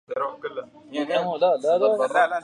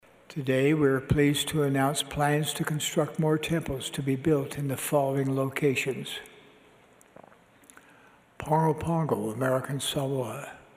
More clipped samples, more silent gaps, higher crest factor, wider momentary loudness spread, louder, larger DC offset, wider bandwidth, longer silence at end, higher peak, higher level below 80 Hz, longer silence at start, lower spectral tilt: neither; neither; about the same, 16 dB vs 16 dB; first, 14 LU vs 8 LU; first, -23 LUFS vs -27 LUFS; neither; second, 11 kHz vs 15.5 kHz; second, 0 s vs 0.15 s; first, -8 dBFS vs -12 dBFS; second, -74 dBFS vs -54 dBFS; second, 0.1 s vs 0.3 s; about the same, -4.5 dB/octave vs -5 dB/octave